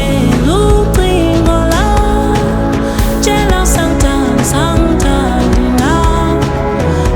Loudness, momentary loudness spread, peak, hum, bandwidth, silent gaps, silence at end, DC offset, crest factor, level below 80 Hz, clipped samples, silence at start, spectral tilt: -11 LUFS; 3 LU; 0 dBFS; none; over 20 kHz; none; 0 s; under 0.1%; 10 dB; -16 dBFS; under 0.1%; 0 s; -5.5 dB/octave